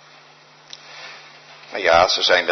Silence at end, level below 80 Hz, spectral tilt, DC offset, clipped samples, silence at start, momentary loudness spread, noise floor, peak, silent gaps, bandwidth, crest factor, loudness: 0 s; -58 dBFS; -1.5 dB/octave; under 0.1%; under 0.1%; 0.9 s; 25 LU; -48 dBFS; -2 dBFS; none; 6.4 kHz; 18 dB; -16 LUFS